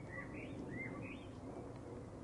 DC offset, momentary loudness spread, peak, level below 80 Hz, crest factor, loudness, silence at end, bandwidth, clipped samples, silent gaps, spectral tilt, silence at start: under 0.1%; 5 LU; -34 dBFS; -64 dBFS; 14 dB; -49 LUFS; 0 s; 11 kHz; under 0.1%; none; -7 dB/octave; 0 s